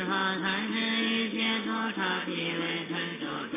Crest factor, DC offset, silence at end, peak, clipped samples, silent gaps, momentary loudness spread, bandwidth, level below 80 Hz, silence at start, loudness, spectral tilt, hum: 14 dB; under 0.1%; 0 s; -16 dBFS; under 0.1%; none; 6 LU; 3.9 kHz; -72 dBFS; 0 s; -29 LUFS; -2 dB/octave; none